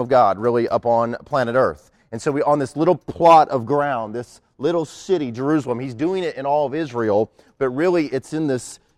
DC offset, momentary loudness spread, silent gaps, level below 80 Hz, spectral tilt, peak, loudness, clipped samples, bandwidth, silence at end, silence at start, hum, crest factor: under 0.1%; 10 LU; none; -56 dBFS; -6.5 dB/octave; -2 dBFS; -20 LUFS; under 0.1%; 12.5 kHz; 0.2 s; 0 s; none; 16 dB